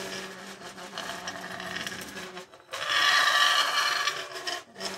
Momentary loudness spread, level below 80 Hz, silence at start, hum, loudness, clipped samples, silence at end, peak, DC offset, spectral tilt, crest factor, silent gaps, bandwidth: 20 LU; -70 dBFS; 0 s; none; -26 LUFS; under 0.1%; 0 s; -8 dBFS; under 0.1%; 0 dB/octave; 22 dB; none; 16 kHz